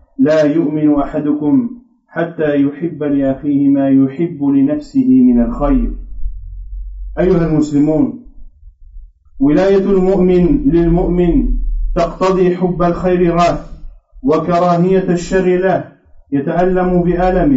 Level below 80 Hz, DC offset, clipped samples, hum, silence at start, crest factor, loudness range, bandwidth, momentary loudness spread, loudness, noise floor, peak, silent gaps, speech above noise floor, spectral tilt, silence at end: -26 dBFS; under 0.1%; under 0.1%; none; 0.2 s; 10 dB; 3 LU; 8 kHz; 11 LU; -14 LUFS; -38 dBFS; -2 dBFS; none; 26 dB; -8 dB/octave; 0 s